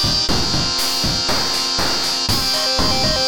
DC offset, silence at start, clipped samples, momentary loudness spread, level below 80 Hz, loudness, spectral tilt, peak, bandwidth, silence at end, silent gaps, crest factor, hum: 3%; 0 s; under 0.1%; 1 LU; -32 dBFS; -16 LUFS; -2.5 dB/octave; -4 dBFS; 19 kHz; 0 s; none; 14 dB; none